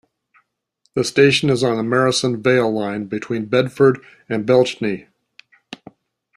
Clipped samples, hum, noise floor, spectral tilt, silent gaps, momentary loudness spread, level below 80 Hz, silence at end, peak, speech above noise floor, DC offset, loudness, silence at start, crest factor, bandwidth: under 0.1%; none; -67 dBFS; -5 dB/octave; none; 15 LU; -58 dBFS; 0.6 s; -2 dBFS; 50 dB; under 0.1%; -18 LUFS; 0.95 s; 18 dB; 13 kHz